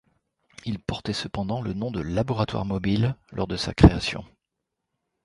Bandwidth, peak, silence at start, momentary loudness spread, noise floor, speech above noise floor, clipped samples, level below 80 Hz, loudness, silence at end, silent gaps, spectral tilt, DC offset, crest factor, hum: 11.5 kHz; 0 dBFS; 0.65 s; 14 LU; -83 dBFS; 59 dB; under 0.1%; -36 dBFS; -25 LUFS; 1 s; none; -6.5 dB/octave; under 0.1%; 26 dB; none